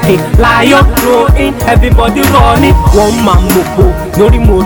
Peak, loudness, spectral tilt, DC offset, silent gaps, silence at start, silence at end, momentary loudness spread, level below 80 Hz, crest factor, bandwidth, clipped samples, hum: 0 dBFS; -7 LUFS; -6 dB/octave; under 0.1%; none; 0 s; 0 s; 4 LU; -12 dBFS; 6 dB; over 20 kHz; 3%; none